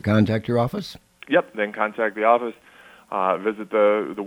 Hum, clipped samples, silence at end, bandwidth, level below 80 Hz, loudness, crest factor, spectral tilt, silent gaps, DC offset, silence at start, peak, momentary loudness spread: none; under 0.1%; 0 s; 15.5 kHz; -58 dBFS; -22 LUFS; 20 dB; -7.5 dB/octave; none; under 0.1%; 0.05 s; -2 dBFS; 12 LU